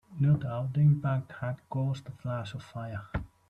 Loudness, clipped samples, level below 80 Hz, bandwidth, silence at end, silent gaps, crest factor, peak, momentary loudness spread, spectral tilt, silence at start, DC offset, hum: -31 LUFS; under 0.1%; -52 dBFS; 8 kHz; 0.2 s; none; 14 dB; -16 dBFS; 14 LU; -9 dB/octave; 0.1 s; under 0.1%; none